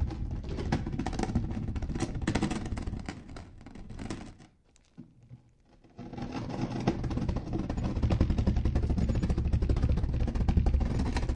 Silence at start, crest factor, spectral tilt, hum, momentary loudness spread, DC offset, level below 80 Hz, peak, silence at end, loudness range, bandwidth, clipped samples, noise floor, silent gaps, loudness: 0 s; 20 dB; -7 dB/octave; none; 15 LU; under 0.1%; -34 dBFS; -12 dBFS; 0 s; 14 LU; 10 kHz; under 0.1%; -63 dBFS; none; -32 LUFS